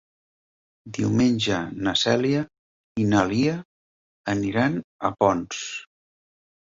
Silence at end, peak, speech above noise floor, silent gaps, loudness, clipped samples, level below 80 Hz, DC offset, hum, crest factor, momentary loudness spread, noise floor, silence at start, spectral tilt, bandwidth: 0.8 s; -4 dBFS; over 67 dB; 2.59-2.95 s, 3.65-4.24 s, 4.84-4.99 s; -23 LUFS; under 0.1%; -54 dBFS; under 0.1%; none; 20 dB; 14 LU; under -90 dBFS; 0.85 s; -5 dB/octave; 7.8 kHz